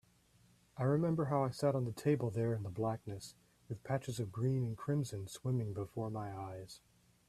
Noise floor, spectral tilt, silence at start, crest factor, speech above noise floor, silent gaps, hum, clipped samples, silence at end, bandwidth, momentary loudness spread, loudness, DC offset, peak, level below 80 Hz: -69 dBFS; -7.5 dB/octave; 0.75 s; 18 dB; 32 dB; none; none; under 0.1%; 0.5 s; 14 kHz; 15 LU; -38 LUFS; under 0.1%; -20 dBFS; -68 dBFS